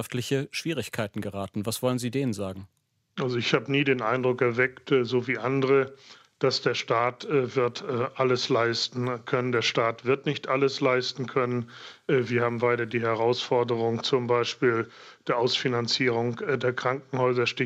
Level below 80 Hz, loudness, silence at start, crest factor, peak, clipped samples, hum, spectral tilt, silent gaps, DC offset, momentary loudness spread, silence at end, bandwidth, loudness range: -72 dBFS; -26 LUFS; 0 s; 18 dB; -8 dBFS; under 0.1%; none; -5 dB/octave; none; under 0.1%; 7 LU; 0 s; 15.5 kHz; 2 LU